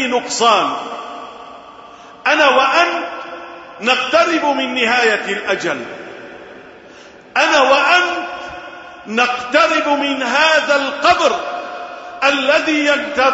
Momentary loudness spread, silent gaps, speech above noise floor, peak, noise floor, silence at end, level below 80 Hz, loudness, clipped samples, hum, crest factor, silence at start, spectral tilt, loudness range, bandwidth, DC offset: 20 LU; none; 25 dB; 0 dBFS; -40 dBFS; 0 s; -56 dBFS; -14 LUFS; under 0.1%; none; 16 dB; 0 s; -2 dB/octave; 3 LU; 8 kHz; under 0.1%